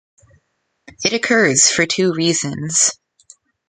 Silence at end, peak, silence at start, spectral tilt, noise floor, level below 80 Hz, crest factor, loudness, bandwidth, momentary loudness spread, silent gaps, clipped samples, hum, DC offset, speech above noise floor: 0.75 s; 0 dBFS; 1 s; -2.5 dB/octave; -67 dBFS; -58 dBFS; 18 dB; -15 LUFS; 9.6 kHz; 8 LU; none; under 0.1%; none; under 0.1%; 51 dB